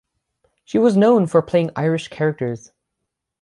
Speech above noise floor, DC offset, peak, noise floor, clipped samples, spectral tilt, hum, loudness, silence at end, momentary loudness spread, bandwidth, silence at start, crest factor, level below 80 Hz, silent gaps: 62 dB; under 0.1%; -2 dBFS; -79 dBFS; under 0.1%; -7.5 dB/octave; none; -18 LUFS; 0.85 s; 12 LU; 11 kHz; 0.75 s; 16 dB; -60 dBFS; none